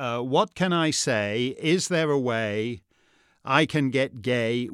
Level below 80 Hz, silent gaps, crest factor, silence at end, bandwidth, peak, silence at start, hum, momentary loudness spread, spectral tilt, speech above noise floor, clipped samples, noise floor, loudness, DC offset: -68 dBFS; none; 20 dB; 0 s; 14.5 kHz; -4 dBFS; 0 s; none; 6 LU; -4.5 dB/octave; 39 dB; under 0.1%; -63 dBFS; -24 LUFS; under 0.1%